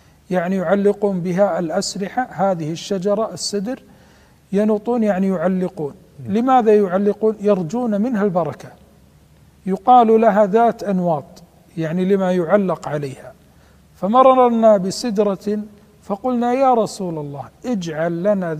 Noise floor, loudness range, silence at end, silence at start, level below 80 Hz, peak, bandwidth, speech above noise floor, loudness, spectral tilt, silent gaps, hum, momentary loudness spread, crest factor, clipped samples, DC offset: -50 dBFS; 5 LU; 0 s; 0.3 s; -56 dBFS; 0 dBFS; 15 kHz; 32 dB; -18 LUFS; -6.5 dB/octave; none; none; 13 LU; 18 dB; under 0.1%; under 0.1%